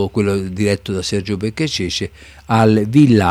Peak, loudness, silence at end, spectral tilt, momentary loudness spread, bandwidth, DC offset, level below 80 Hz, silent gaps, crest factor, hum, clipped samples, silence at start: 0 dBFS; -16 LUFS; 0 s; -6 dB/octave; 10 LU; 14.5 kHz; under 0.1%; -44 dBFS; none; 14 dB; none; under 0.1%; 0 s